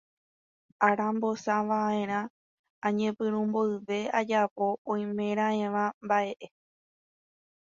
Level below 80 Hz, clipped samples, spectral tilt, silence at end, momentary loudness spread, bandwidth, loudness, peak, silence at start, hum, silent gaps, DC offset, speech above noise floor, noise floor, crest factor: -76 dBFS; under 0.1%; -6 dB/octave; 1.3 s; 6 LU; 7.4 kHz; -29 LUFS; -10 dBFS; 0.8 s; none; 2.30-2.64 s, 2.70-2.82 s, 4.51-4.56 s, 4.78-4.85 s, 5.94-6.01 s; under 0.1%; over 62 dB; under -90 dBFS; 20 dB